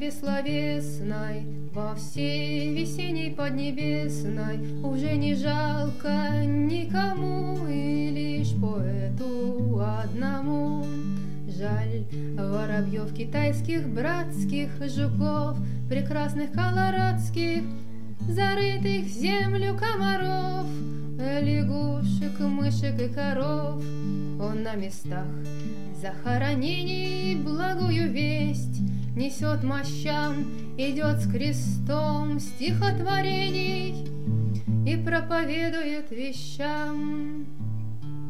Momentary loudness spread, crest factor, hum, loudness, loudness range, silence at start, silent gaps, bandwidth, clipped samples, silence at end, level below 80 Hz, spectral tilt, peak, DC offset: 8 LU; 16 dB; none; -28 LUFS; 3 LU; 0 s; none; 14 kHz; under 0.1%; 0 s; -58 dBFS; -6.5 dB/octave; -12 dBFS; 3%